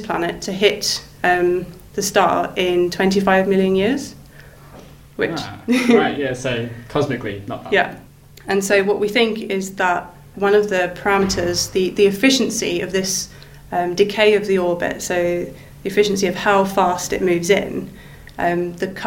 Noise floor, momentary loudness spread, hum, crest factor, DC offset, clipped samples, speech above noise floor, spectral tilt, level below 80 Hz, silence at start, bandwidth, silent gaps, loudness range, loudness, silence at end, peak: -42 dBFS; 10 LU; none; 18 dB; under 0.1%; under 0.1%; 24 dB; -4 dB/octave; -46 dBFS; 0 s; 17 kHz; none; 3 LU; -18 LUFS; 0 s; -2 dBFS